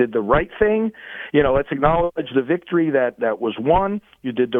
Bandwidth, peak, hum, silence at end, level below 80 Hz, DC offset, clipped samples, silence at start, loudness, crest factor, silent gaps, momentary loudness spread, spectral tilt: 3.9 kHz; -2 dBFS; none; 0 s; -38 dBFS; under 0.1%; under 0.1%; 0 s; -20 LUFS; 16 dB; none; 7 LU; -9.5 dB/octave